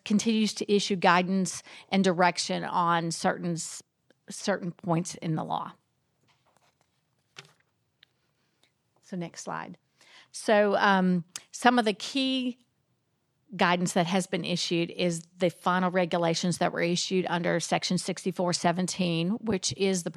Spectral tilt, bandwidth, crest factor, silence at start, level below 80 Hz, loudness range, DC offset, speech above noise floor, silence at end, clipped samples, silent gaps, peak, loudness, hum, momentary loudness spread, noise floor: -4.5 dB/octave; 13 kHz; 24 dB; 0.05 s; -72 dBFS; 13 LU; under 0.1%; 47 dB; 0.05 s; under 0.1%; none; -4 dBFS; -27 LUFS; none; 13 LU; -75 dBFS